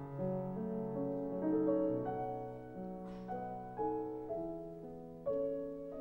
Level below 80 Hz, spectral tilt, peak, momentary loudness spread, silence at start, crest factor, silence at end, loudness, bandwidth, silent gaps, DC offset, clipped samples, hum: -64 dBFS; -10.5 dB/octave; -22 dBFS; 12 LU; 0 s; 16 dB; 0 s; -40 LUFS; 5.6 kHz; none; under 0.1%; under 0.1%; none